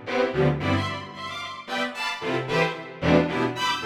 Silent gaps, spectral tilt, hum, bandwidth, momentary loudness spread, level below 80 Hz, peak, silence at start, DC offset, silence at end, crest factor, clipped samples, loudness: none; -5.5 dB/octave; none; 15.5 kHz; 11 LU; -48 dBFS; -6 dBFS; 0 s; under 0.1%; 0 s; 20 dB; under 0.1%; -25 LUFS